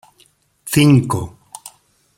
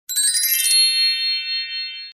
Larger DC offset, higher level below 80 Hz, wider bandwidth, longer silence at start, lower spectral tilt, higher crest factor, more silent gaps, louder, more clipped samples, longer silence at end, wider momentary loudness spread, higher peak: neither; first, -48 dBFS vs -72 dBFS; about the same, 16.5 kHz vs 16 kHz; first, 0.65 s vs 0.1 s; first, -6 dB/octave vs 7.5 dB/octave; about the same, 16 dB vs 14 dB; neither; about the same, -15 LUFS vs -16 LUFS; neither; first, 0.5 s vs 0.05 s; first, 24 LU vs 10 LU; first, -2 dBFS vs -6 dBFS